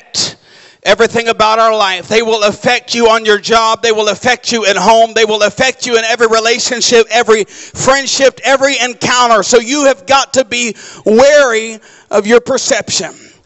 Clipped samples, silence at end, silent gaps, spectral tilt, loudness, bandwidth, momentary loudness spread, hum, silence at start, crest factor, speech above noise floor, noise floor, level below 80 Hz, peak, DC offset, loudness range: under 0.1%; 0.3 s; none; -2 dB/octave; -10 LUFS; 8.4 kHz; 7 LU; none; 0.15 s; 10 dB; 31 dB; -41 dBFS; -46 dBFS; 0 dBFS; under 0.1%; 1 LU